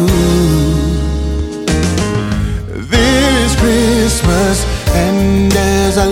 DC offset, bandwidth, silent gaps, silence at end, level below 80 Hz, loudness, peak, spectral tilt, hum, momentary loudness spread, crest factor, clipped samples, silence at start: under 0.1%; 17 kHz; none; 0 s; -18 dBFS; -13 LUFS; 0 dBFS; -5 dB/octave; none; 6 LU; 12 dB; under 0.1%; 0 s